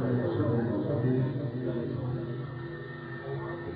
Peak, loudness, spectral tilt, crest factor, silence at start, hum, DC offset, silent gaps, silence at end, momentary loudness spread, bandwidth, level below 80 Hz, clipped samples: -16 dBFS; -32 LUFS; -12 dB/octave; 14 dB; 0 s; none; under 0.1%; none; 0 s; 11 LU; 4.9 kHz; -58 dBFS; under 0.1%